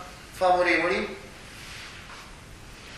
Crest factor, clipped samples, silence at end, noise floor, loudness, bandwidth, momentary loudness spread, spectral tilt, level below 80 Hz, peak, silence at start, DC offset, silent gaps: 18 dB; under 0.1%; 0 s; -45 dBFS; -24 LUFS; 15 kHz; 23 LU; -4 dB/octave; -50 dBFS; -10 dBFS; 0 s; under 0.1%; none